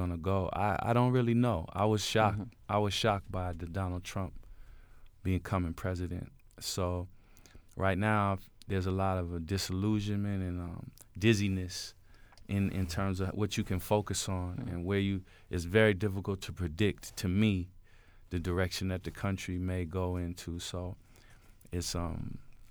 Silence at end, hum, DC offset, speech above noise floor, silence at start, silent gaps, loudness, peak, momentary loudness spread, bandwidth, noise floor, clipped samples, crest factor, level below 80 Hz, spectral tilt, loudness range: 0.05 s; none; under 0.1%; 25 dB; 0 s; none; -33 LUFS; -12 dBFS; 12 LU; over 20 kHz; -57 dBFS; under 0.1%; 20 dB; -50 dBFS; -5.5 dB/octave; 7 LU